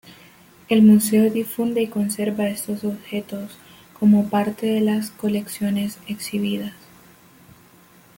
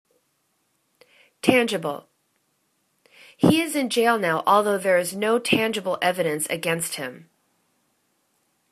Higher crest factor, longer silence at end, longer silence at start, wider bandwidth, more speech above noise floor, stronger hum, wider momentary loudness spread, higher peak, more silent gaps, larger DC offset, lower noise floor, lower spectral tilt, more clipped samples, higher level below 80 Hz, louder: second, 16 dB vs 22 dB; about the same, 1.45 s vs 1.55 s; second, 0.1 s vs 1.45 s; first, 17 kHz vs 14 kHz; second, 31 dB vs 49 dB; neither; first, 14 LU vs 9 LU; second, -6 dBFS vs -2 dBFS; neither; neither; second, -51 dBFS vs -70 dBFS; first, -6 dB/octave vs -4 dB/octave; neither; about the same, -62 dBFS vs -64 dBFS; about the same, -21 LUFS vs -22 LUFS